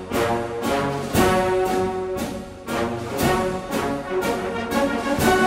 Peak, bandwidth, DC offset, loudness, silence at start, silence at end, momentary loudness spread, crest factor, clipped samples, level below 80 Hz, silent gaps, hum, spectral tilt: -4 dBFS; 16.5 kHz; under 0.1%; -23 LUFS; 0 s; 0 s; 7 LU; 18 dB; under 0.1%; -40 dBFS; none; none; -5 dB/octave